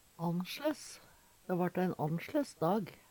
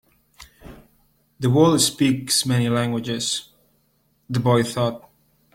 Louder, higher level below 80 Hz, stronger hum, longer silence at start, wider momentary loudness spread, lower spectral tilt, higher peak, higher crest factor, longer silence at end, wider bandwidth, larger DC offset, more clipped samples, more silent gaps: second, -36 LUFS vs -20 LUFS; second, -74 dBFS vs -54 dBFS; neither; second, 0.2 s vs 0.4 s; first, 13 LU vs 10 LU; first, -6.5 dB/octave vs -4.5 dB/octave; second, -20 dBFS vs -4 dBFS; about the same, 16 dB vs 20 dB; second, 0.15 s vs 0.55 s; first, 19 kHz vs 16.5 kHz; neither; neither; neither